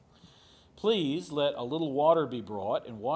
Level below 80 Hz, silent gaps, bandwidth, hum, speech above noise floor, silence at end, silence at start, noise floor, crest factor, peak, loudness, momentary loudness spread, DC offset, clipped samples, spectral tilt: -66 dBFS; none; 8 kHz; none; 30 dB; 0 s; 0.75 s; -59 dBFS; 18 dB; -12 dBFS; -30 LUFS; 8 LU; under 0.1%; under 0.1%; -6.5 dB/octave